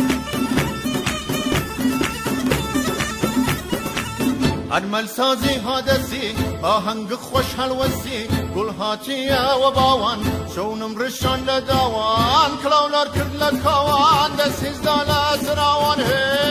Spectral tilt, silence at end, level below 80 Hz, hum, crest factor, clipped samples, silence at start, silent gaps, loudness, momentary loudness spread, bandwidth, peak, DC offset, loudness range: -4.5 dB/octave; 0 s; -36 dBFS; none; 16 dB; under 0.1%; 0 s; none; -19 LUFS; 7 LU; 16 kHz; -4 dBFS; under 0.1%; 4 LU